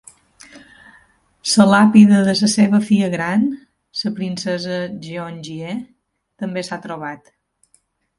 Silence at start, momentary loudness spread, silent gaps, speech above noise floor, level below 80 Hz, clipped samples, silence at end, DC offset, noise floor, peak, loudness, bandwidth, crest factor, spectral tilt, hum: 0.55 s; 19 LU; none; 45 dB; -60 dBFS; under 0.1%; 1.05 s; under 0.1%; -61 dBFS; 0 dBFS; -16 LUFS; 11.5 kHz; 18 dB; -5 dB/octave; none